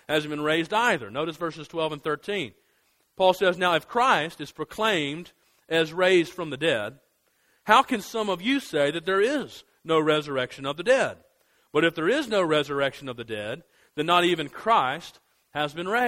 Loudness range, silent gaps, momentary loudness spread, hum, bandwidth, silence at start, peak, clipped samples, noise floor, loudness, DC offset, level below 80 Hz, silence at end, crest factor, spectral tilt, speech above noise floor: 2 LU; none; 14 LU; none; 16 kHz; 0.1 s; -2 dBFS; under 0.1%; -68 dBFS; -25 LUFS; under 0.1%; -64 dBFS; 0 s; 24 dB; -4.5 dB/octave; 43 dB